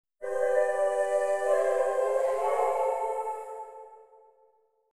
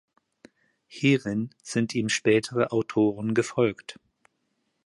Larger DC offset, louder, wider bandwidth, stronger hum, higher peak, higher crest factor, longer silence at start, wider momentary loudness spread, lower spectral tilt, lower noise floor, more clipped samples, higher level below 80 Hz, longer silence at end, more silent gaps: neither; second, -28 LUFS vs -25 LUFS; first, 13.5 kHz vs 11.5 kHz; neither; second, -14 dBFS vs -8 dBFS; about the same, 14 dB vs 18 dB; second, 0.2 s vs 0.9 s; first, 13 LU vs 9 LU; second, -2 dB/octave vs -5.5 dB/octave; second, -66 dBFS vs -75 dBFS; neither; second, -72 dBFS vs -64 dBFS; second, 0.4 s vs 0.95 s; neither